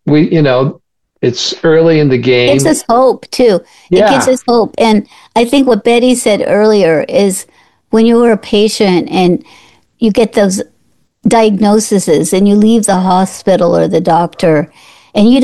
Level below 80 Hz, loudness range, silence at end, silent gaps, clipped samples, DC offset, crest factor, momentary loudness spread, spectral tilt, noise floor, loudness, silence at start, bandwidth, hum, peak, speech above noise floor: -44 dBFS; 2 LU; 0 s; none; under 0.1%; 0.6%; 10 dB; 6 LU; -5.5 dB/octave; -57 dBFS; -10 LUFS; 0.05 s; 12.5 kHz; none; 0 dBFS; 48 dB